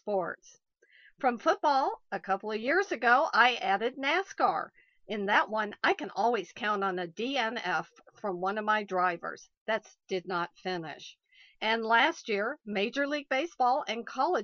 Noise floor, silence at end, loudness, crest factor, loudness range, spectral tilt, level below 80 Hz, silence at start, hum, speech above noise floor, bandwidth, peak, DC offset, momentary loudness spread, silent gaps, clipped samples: -62 dBFS; 0 s; -30 LUFS; 20 dB; 5 LU; -4 dB/octave; -78 dBFS; 0.05 s; none; 32 dB; 7 kHz; -10 dBFS; under 0.1%; 12 LU; 9.57-9.66 s; under 0.1%